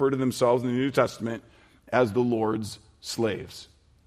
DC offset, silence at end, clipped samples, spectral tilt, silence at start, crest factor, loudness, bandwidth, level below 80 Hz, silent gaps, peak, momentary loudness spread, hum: under 0.1%; 0.4 s; under 0.1%; -6 dB/octave; 0 s; 18 dB; -26 LUFS; 14.5 kHz; -62 dBFS; none; -8 dBFS; 16 LU; none